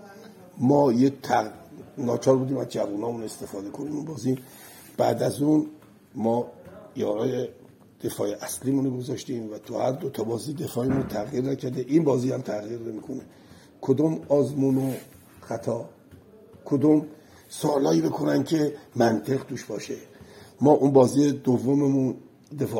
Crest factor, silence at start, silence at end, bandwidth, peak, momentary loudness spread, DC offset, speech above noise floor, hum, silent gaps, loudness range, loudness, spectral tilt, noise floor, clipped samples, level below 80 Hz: 22 dB; 0 s; 0 s; 17 kHz; -4 dBFS; 16 LU; under 0.1%; 26 dB; none; none; 6 LU; -25 LUFS; -7 dB/octave; -50 dBFS; under 0.1%; -64 dBFS